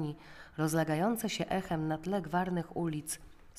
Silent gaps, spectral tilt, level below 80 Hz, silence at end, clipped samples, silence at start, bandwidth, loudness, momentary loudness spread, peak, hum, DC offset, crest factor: none; -5.5 dB/octave; -58 dBFS; 0 s; under 0.1%; 0 s; 15.5 kHz; -34 LUFS; 10 LU; -18 dBFS; none; under 0.1%; 16 dB